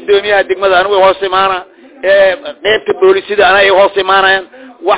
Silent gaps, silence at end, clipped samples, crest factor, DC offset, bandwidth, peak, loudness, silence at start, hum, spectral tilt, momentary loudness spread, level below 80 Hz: none; 0 s; under 0.1%; 10 dB; 0.4%; 4 kHz; 0 dBFS; -9 LUFS; 0 s; none; -7 dB/octave; 7 LU; -46 dBFS